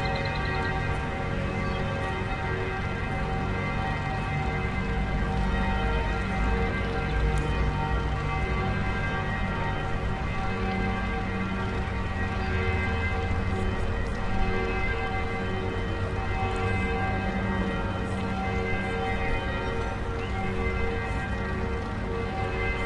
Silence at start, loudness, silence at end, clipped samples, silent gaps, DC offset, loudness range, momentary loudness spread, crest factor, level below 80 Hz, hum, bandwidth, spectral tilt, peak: 0 s; -29 LUFS; 0 s; under 0.1%; none; under 0.1%; 2 LU; 3 LU; 14 dB; -32 dBFS; none; 11 kHz; -7 dB/octave; -14 dBFS